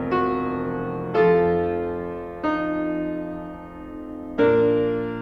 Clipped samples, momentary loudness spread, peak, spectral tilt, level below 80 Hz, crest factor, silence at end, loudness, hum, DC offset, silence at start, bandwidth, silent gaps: under 0.1%; 17 LU; -8 dBFS; -9 dB/octave; -48 dBFS; 16 dB; 0 s; -23 LUFS; none; under 0.1%; 0 s; 5.4 kHz; none